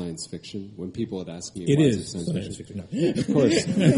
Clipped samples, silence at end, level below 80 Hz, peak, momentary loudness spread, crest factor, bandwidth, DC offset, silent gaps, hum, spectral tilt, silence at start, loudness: under 0.1%; 0 s; -54 dBFS; -6 dBFS; 15 LU; 18 dB; 11.5 kHz; under 0.1%; none; none; -6 dB/octave; 0 s; -25 LUFS